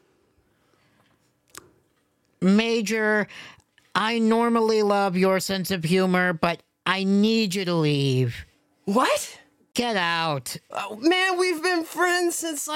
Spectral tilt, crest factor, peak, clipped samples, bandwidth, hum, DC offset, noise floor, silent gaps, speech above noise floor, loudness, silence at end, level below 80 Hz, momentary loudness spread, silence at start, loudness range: -4.5 dB/octave; 20 dB; -4 dBFS; under 0.1%; 17 kHz; none; under 0.1%; -68 dBFS; none; 45 dB; -23 LUFS; 0 s; -62 dBFS; 9 LU; 2.4 s; 4 LU